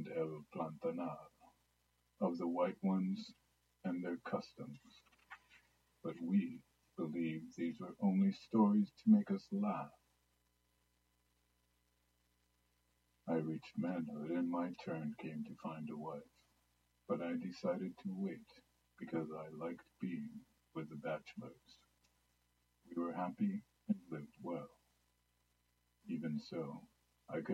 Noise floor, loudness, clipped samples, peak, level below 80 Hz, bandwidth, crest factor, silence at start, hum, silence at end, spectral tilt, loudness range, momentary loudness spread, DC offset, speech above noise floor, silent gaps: -80 dBFS; -41 LUFS; under 0.1%; -20 dBFS; -82 dBFS; 7.6 kHz; 22 dB; 0 s; 60 Hz at -70 dBFS; 0 s; -8.5 dB/octave; 12 LU; 18 LU; under 0.1%; 40 dB; none